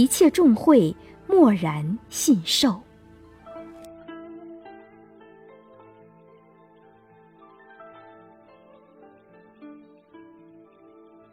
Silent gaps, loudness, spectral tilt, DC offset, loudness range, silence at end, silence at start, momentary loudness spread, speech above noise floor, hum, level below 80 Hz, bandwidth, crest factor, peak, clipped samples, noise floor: none; -20 LUFS; -4.5 dB/octave; under 0.1%; 26 LU; 1.6 s; 0 s; 26 LU; 35 dB; none; -60 dBFS; 17 kHz; 20 dB; -4 dBFS; under 0.1%; -54 dBFS